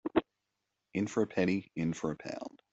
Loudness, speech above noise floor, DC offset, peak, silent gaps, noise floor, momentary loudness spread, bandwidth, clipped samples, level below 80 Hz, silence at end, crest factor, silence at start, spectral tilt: -35 LUFS; 52 dB; under 0.1%; -14 dBFS; none; -85 dBFS; 10 LU; 8.2 kHz; under 0.1%; -66 dBFS; 0.15 s; 20 dB; 0.05 s; -6.5 dB/octave